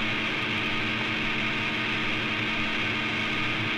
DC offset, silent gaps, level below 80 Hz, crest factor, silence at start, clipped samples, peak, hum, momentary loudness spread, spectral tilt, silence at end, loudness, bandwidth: under 0.1%; none; -46 dBFS; 14 dB; 0 s; under 0.1%; -14 dBFS; none; 0 LU; -4.5 dB/octave; 0 s; -26 LUFS; 13.5 kHz